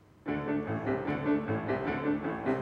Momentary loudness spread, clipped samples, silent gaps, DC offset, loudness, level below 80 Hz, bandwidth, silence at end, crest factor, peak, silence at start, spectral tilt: 3 LU; under 0.1%; none; under 0.1%; -32 LUFS; -58 dBFS; 5.4 kHz; 0 s; 14 dB; -18 dBFS; 0.25 s; -9 dB/octave